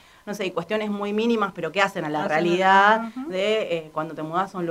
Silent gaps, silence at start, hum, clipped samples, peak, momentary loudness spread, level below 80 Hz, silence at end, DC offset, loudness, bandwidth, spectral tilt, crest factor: none; 0.25 s; none; under 0.1%; -4 dBFS; 13 LU; -64 dBFS; 0 s; under 0.1%; -23 LUFS; 15.5 kHz; -5 dB/octave; 18 dB